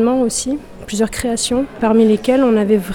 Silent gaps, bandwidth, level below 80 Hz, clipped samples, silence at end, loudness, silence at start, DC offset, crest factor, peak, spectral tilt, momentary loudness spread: none; 17.5 kHz; -40 dBFS; under 0.1%; 0 s; -16 LUFS; 0 s; under 0.1%; 12 dB; -2 dBFS; -4.5 dB/octave; 9 LU